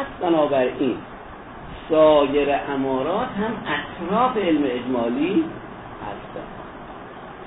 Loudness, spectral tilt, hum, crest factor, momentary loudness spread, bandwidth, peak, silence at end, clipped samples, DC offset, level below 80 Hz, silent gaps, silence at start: -21 LUFS; -10 dB/octave; none; 16 dB; 20 LU; 4 kHz; -6 dBFS; 0 s; under 0.1%; under 0.1%; -48 dBFS; none; 0 s